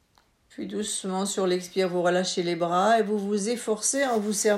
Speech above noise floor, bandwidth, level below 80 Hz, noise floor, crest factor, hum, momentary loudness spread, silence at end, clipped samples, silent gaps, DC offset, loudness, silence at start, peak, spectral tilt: 39 dB; 15.5 kHz; -70 dBFS; -64 dBFS; 16 dB; none; 7 LU; 0 s; under 0.1%; none; under 0.1%; -25 LUFS; 0.6 s; -10 dBFS; -3.5 dB/octave